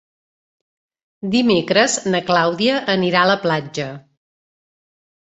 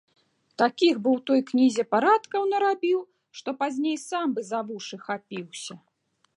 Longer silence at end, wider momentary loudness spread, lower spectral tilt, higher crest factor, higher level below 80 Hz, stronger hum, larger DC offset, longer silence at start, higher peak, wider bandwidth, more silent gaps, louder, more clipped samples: first, 1.3 s vs 0.6 s; second, 12 LU vs 15 LU; about the same, -4 dB/octave vs -4 dB/octave; about the same, 18 dB vs 18 dB; first, -60 dBFS vs -82 dBFS; neither; neither; first, 1.25 s vs 0.6 s; first, -2 dBFS vs -8 dBFS; second, 8.2 kHz vs 11.5 kHz; neither; first, -17 LUFS vs -25 LUFS; neither